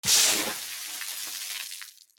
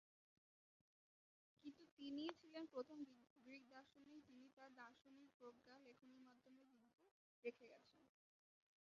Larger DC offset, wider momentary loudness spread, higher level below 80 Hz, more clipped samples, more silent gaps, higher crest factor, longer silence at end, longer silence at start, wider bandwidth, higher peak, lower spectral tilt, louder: neither; about the same, 16 LU vs 15 LU; first, -68 dBFS vs under -90 dBFS; neither; second, none vs 1.91-1.97 s, 3.30-3.36 s, 4.53-4.57 s, 5.34-5.40 s, 7.11-7.43 s; second, 20 dB vs 30 dB; second, 0.25 s vs 0.9 s; second, 0.05 s vs 1.6 s; first, over 20 kHz vs 7.2 kHz; first, -10 dBFS vs -32 dBFS; second, 1 dB/octave vs -2 dB/octave; first, -26 LUFS vs -59 LUFS